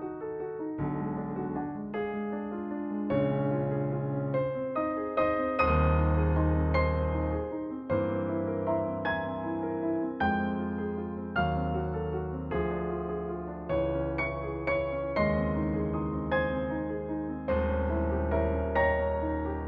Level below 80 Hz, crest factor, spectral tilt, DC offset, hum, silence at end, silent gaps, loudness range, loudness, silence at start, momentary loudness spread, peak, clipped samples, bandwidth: -38 dBFS; 16 dB; -7 dB/octave; under 0.1%; none; 0 s; none; 4 LU; -31 LUFS; 0 s; 8 LU; -14 dBFS; under 0.1%; 5.4 kHz